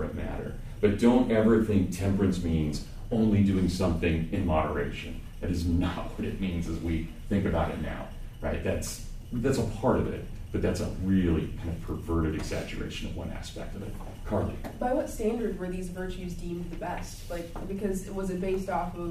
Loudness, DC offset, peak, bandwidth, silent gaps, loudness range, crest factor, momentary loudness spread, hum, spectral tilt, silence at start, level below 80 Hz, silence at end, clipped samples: -30 LUFS; under 0.1%; -10 dBFS; 15.5 kHz; none; 8 LU; 18 dB; 14 LU; none; -7 dB/octave; 0 s; -38 dBFS; 0 s; under 0.1%